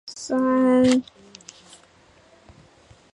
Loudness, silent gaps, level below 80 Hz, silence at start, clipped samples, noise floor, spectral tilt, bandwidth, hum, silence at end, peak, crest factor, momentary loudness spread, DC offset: -20 LUFS; none; -60 dBFS; 0.05 s; under 0.1%; -55 dBFS; -4.5 dB/octave; 11 kHz; none; 2.1 s; -6 dBFS; 18 dB; 27 LU; under 0.1%